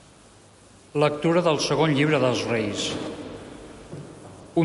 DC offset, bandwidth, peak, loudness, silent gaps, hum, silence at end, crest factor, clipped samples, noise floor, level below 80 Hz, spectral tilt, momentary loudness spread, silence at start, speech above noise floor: under 0.1%; 11.5 kHz; -8 dBFS; -23 LUFS; none; none; 0 s; 16 dB; under 0.1%; -51 dBFS; -56 dBFS; -5 dB/octave; 21 LU; 0.95 s; 29 dB